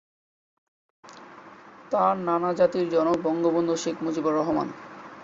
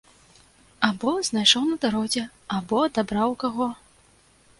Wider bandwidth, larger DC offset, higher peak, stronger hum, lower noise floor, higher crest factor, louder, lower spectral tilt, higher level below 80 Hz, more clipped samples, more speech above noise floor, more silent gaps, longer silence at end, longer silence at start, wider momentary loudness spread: second, 7.8 kHz vs 11.5 kHz; neither; second, -8 dBFS vs -2 dBFS; neither; second, -47 dBFS vs -58 dBFS; second, 18 dB vs 24 dB; about the same, -25 LUFS vs -23 LUFS; first, -6 dB/octave vs -3 dB/octave; second, -66 dBFS vs -58 dBFS; neither; second, 24 dB vs 34 dB; neither; second, 0 s vs 0.85 s; first, 1.05 s vs 0.8 s; first, 16 LU vs 11 LU